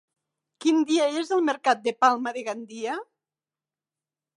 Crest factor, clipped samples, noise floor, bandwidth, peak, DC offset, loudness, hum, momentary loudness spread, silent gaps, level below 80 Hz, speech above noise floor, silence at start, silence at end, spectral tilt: 20 dB; under 0.1%; under -90 dBFS; 10.5 kHz; -6 dBFS; under 0.1%; -25 LUFS; none; 11 LU; none; -86 dBFS; over 66 dB; 0.6 s; 1.35 s; -2.5 dB/octave